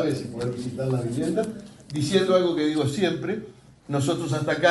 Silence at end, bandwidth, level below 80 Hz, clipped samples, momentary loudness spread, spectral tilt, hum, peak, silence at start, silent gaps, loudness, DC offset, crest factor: 0 s; 11.5 kHz; -58 dBFS; under 0.1%; 11 LU; -6 dB/octave; none; -6 dBFS; 0 s; none; -25 LUFS; under 0.1%; 18 dB